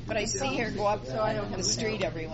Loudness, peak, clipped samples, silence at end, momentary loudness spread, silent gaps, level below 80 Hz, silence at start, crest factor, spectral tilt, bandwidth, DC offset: -29 LUFS; -16 dBFS; under 0.1%; 0 s; 2 LU; none; -44 dBFS; 0 s; 14 dB; -3.5 dB/octave; 8 kHz; under 0.1%